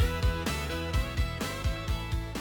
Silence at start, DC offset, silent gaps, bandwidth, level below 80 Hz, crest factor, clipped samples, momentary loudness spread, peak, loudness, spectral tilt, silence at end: 0 s; under 0.1%; none; 18.5 kHz; -34 dBFS; 16 dB; under 0.1%; 4 LU; -14 dBFS; -32 LUFS; -5 dB/octave; 0 s